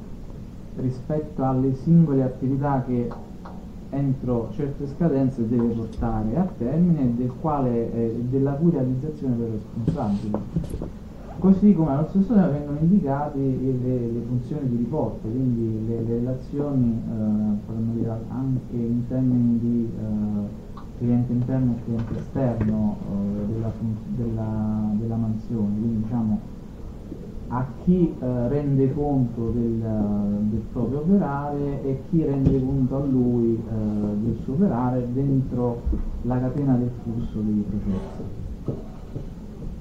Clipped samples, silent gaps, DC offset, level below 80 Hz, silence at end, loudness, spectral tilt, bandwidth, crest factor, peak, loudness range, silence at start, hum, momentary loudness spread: under 0.1%; none; 0.2%; -38 dBFS; 0 s; -24 LUFS; -11 dB/octave; 7.4 kHz; 18 dB; -4 dBFS; 4 LU; 0 s; none; 12 LU